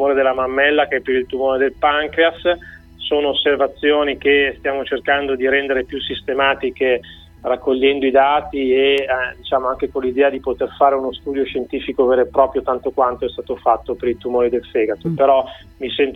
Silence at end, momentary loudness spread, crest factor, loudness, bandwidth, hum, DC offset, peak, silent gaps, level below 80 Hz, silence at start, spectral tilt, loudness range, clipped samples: 0 s; 8 LU; 18 dB; -18 LUFS; 4.2 kHz; none; under 0.1%; 0 dBFS; none; -44 dBFS; 0 s; -6.5 dB/octave; 2 LU; under 0.1%